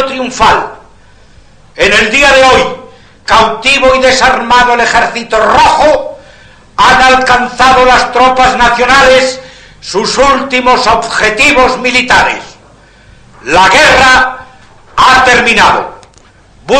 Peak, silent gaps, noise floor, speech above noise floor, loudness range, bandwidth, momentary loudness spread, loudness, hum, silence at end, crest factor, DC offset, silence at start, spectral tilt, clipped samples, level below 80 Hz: 0 dBFS; none; -40 dBFS; 34 dB; 2 LU; 15 kHz; 11 LU; -6 LUFS; none; 0 s; 8 dB; under 0.1%; 0 s; -2.5 dB/octave; 1%; -30 dBFS